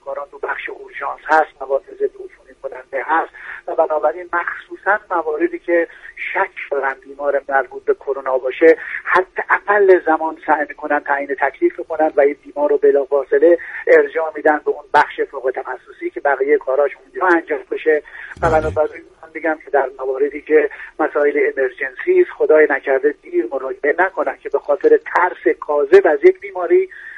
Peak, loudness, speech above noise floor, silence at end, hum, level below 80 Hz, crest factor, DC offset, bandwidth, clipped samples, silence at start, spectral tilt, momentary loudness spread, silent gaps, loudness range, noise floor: 0 dBFS; -17 LUFS; 21 dB; 0 s; none; -48 dBFS; 16 dB; under 0.1%; 7.8 kHz; under 0.1%; 0.05 s; -6.5 dB/octave; 11 LU; none; 5 LU; -37 dBFS